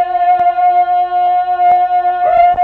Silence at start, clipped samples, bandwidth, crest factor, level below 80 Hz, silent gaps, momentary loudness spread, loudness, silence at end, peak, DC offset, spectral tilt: 0 s; under 0.1%; 4.3 kHz; 10 dB; -46 dBFS; none; 3 LU; -12 LUFS; 0 s; -2 dBFS; under 0.1%; -6 dB/octave